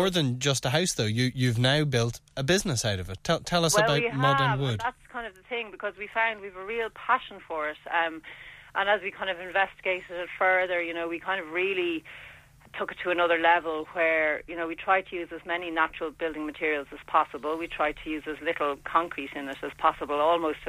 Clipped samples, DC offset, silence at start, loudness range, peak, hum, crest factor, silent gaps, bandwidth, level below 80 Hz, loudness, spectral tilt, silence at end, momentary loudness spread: under 0.1%; under 0.1%; 0 s; 4 LU; -8 dBFS; none; 20 dB; none; 15.5 kHz; -54 dBFS; -27 LUFS; -4 dB/octave; 0 s; 12 LU